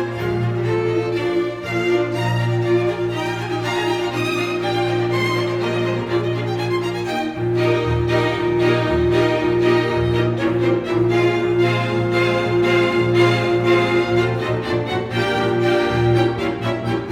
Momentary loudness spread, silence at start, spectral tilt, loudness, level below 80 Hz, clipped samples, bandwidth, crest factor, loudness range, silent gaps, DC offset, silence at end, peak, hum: 6 LU; 0 s; -6.5 dB/octave; -19 LUFS; -42 dBFS; under 0.1%; 12 kHz; 16 dB; 3 LU; none; under 0.1%; 0 s; -4 dBFS; 60 Hz at -50 dBFS